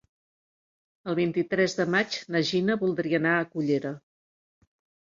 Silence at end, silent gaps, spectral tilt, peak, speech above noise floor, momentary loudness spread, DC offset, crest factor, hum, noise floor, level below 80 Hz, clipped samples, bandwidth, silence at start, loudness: 1.15 s; none; -5.5 dB/octave; -10 dBFS; over 64 dB; 7 LU; under 0.1%; 18 dB; none; under -90 dBFS; -70 dBFS; under 0.1%; 7.6 kHz; 1.05 s; -26 LUFS